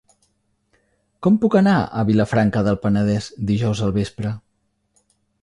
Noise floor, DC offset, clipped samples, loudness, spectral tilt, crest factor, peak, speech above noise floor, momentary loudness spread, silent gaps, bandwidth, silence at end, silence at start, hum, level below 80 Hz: -69 dBFS; under 0.1%; under 0.1%; -19 LUFS; -7.5 dB/octave; 16 dB; -4 dBFS; 51 dB; 9 LU; none; 10.5 kHz; 1.05 s; 1.2 s; none; -46 dBFS